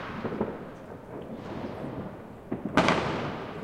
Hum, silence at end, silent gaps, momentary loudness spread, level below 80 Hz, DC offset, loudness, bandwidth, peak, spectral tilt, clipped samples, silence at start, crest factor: none; 0 s; none; 17 LU; -54 dBFS; under 0.1%; -31 LUFS; 16 kHz; -4 dBFS; -5.5 dB/octave; under 0.1%; 0 s; 28 dB